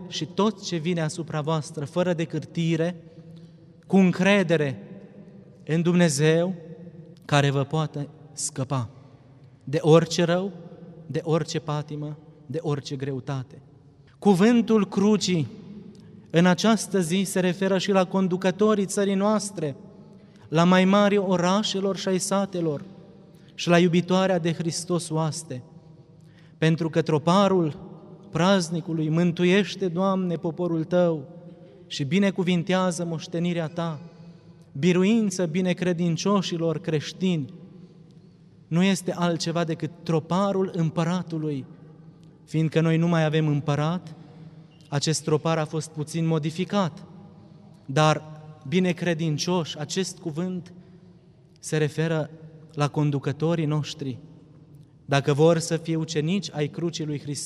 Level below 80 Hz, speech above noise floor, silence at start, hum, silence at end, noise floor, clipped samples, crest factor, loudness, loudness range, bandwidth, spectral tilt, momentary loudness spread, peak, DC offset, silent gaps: -66 dBFS; 30 dB; 0 s; none; 0 s; -53 dBFS; under 0.1%; 22 dB; -24 LUFS; 5 LU; 12.5 kHz; -6 dB/octave; 15 LU; -4 dBFS; under 0.1%; none